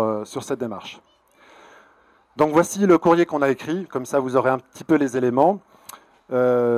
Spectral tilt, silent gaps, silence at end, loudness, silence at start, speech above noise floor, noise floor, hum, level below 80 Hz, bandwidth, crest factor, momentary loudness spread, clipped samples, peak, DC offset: -6 dB/octave; none; 0 s; -21 LUFS; 0 s; 37 dB; -57 dBFS; none; -62 dBFS; 14.5 kHz; 18 dB; 12 LU; under 0.1%; -4 dBFS; under 0.1%